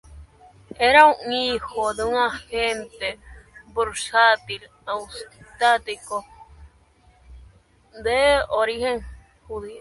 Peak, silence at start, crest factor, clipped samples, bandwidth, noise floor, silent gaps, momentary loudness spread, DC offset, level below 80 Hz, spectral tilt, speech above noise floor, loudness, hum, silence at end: 0 dBFS; 0.1 s; 22 dB; under 0.1%; 11.5 kHz; -56 dBFS; none; 18 LU; under 0.1%; -48 dBFS; -2.5 dB/octave; 35 dB; -21 LUFS; none; 0 s